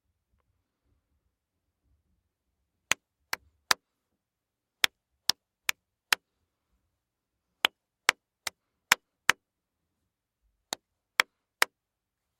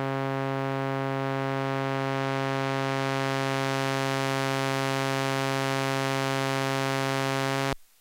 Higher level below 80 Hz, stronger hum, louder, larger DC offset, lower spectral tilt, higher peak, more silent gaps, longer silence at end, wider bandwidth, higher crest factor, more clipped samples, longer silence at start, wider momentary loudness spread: second, -74 dBFS vs -62 dBFS; neither; about the same, -30 LUFS vs -28 LUFS; neither; second, 1 dB/octave vs -5 dB/octave; first, -2 dBFS vs -12 dBFS; neither; first, 0.75 s vs 0.15 s; about the same, 15.5 kHz vs 17 kHz; first, 34 dB vs 16 dB; neither; first, 3.7 s vs 0 s; first, 13 LU vs 2 LU